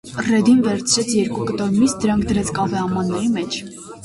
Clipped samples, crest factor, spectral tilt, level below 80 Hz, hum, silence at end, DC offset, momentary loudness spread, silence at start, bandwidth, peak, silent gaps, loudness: under 0.1%; 14 dB; -4.5 dB/octave; -44 dBFS; none; 0 s; under 0.1%; 8 LU; 0.05 s; 11.5 kHz; -4 dBFS; none; -19 LUFS